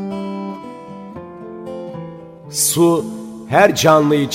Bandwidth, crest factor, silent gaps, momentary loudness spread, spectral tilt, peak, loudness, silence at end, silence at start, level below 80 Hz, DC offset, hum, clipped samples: 16.5 kHz; 18 dB; none; 21 LU; -4 dB/octave; 0 dBFS; -15 LUFS; 0 s; 0 s; -58 dBFS; under 0.1%; none; under 0.1%